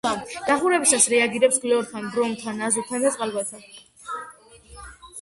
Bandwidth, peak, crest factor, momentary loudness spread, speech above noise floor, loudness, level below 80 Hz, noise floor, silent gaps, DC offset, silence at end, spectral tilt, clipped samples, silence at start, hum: 12 kHz; -2 dBFS; 22 dB; 24 LU; 25 dB; -21 LUFS; -58 dBFS; -47 dBFS; none; under 0.1%; 0 s; -2 dB/octave; under 0.1%; 0.05 s; none